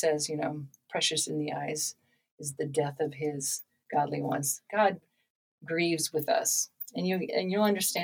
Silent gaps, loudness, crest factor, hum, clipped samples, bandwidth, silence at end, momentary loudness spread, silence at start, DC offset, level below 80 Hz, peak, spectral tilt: 2.31-2.38 s, 5.30-5.58 s; -30 LUFS; 18 dB; none; under 0.1%; 19.5 kHz; 0 s; 9 LU; 0 s; under 0.1%; -80 dBFS; -12 dBFS; -3 dB/octave